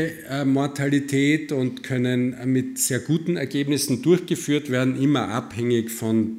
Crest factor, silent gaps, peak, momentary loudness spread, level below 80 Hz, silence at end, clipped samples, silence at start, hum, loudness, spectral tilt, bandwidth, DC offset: 16 dB; none; -6 dBFS; 5 LU; -64 dBFS; 0 s; under 0.1%; 0 s; none; -23 LUFS; -5 dB/octave; 16 kHz; under 0.1%